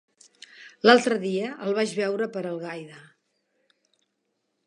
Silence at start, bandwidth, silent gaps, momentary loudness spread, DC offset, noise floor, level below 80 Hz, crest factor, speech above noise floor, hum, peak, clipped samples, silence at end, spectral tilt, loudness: 0.6 s; 11 kHz; none; 24 LU; under 0.1%; -77 dBFS; -82 dBFS; 26 dB; 53 dB; none; 0 dBFS; under 0.1%; 1.65 s; -4.5 dB/octave; -24 LUFS